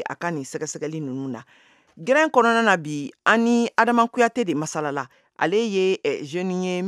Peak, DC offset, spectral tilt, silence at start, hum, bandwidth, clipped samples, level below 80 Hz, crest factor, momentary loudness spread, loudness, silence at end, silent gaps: -2 dBFS; under 0.1%; -4.5 dB/octave; 0 s; none; 12.5 kHz; under 0.1%; -78 dBFS; 20 dB; 13 LU; -22 LUFS; 0 s; none